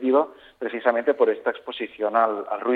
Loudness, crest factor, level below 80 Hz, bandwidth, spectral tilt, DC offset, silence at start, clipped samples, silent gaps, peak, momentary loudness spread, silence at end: -24 LUFS; 18 dB; -72 dBFS; 4.6 kHz; -6.5 dB/octave; under 0.1%; 0 s; under 0.1%; none; -4 dBFS; 10 LU; 0 s